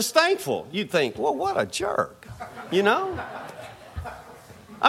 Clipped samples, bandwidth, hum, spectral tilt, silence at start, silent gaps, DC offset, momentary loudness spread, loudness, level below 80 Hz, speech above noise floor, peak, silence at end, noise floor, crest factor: under 0.1%; 16.5 kHz; none; -3.5 dB/octave; 0 s; none; under 0.1%; 19 LU; -25 LUFS; -52 dBFS; 21 dB; -4 dBFS; 0 s; -46 dBFS; 22 dB